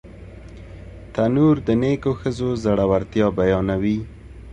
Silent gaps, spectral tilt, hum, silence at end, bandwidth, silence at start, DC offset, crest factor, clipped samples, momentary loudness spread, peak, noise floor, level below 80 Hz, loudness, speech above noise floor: none; -8 dB/octave; none; 0 s; 9.6 kHz; 0.05 s; under 0.1%; 16 dB; under 0.1%; 23 LU; -4 dBFS; -39 dBFS; -40 dBFS; -20 LUFS; 20 dB